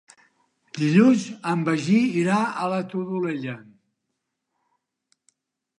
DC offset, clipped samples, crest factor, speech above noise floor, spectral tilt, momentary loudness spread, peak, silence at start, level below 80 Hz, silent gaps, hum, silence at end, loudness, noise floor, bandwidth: under 0.1%; under 0.1%; 20 dB; 58 dB; -6.5 dB/octave; 14 LU; -4 dBFS; 0.75 s; -74 dBFS; none; none; 2.15 s; -22 LUFS; -80 dBFS; 11 kHz